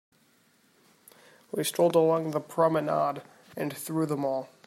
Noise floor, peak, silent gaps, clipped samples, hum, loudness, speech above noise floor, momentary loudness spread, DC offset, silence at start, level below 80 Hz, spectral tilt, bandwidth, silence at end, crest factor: -65 dBFS; -10 dBFS; none; under 0.1%; none; -28 LUFS; 38 dB; 12 LU; under 0.1%; 1.55 s; -78 dBFS; -5.5 dB/octave; 16 kHz; 0.2 s; 18 dB